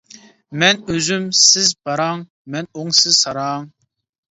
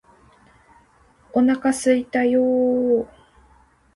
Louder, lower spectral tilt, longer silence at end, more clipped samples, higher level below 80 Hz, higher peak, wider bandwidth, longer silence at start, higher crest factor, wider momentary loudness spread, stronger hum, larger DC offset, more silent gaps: first, -14 LUFS vs -20 LUFS; second, -1.5 dB/octave vs -4.5 dB/octave; second, 0.65 s vs 0.9 s; neither; about the same, -56 dBFS vs -58 dBFS; first, 0 dBFS vs -6 dBFS; second, 8.2 kHz vs 11.5 kHz; second, 0.15 s vs 1.35 s; about the same, 18 dB vs 16 dB; first, 18 LU vs 5 LU; neither; neither; first, 2.30-2.45 s vs none